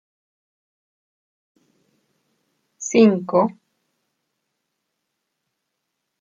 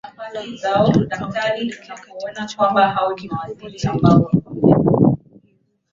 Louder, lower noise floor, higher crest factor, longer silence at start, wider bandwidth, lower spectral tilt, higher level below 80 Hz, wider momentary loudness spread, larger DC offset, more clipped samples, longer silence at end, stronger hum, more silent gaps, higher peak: about the same, -18 LUFS vs -18 LUFS; first, -78 dBFS vs -61 dBFS; first, 22 dB vs 16 dB; first, 2.8 s vs 0.05 s; about the same, 7.6 kHz vs 7.6 kHz; second, -5.5 dB/octave vs -7.5 dB/octave; second, -74 dBFS vs -46 dBFS; second, 10 LU vs 16 LU; neither; neither; first, 2.7 s vs 0.75 s; neither; neither; about the same, -2 dBFS vs -2 dBFS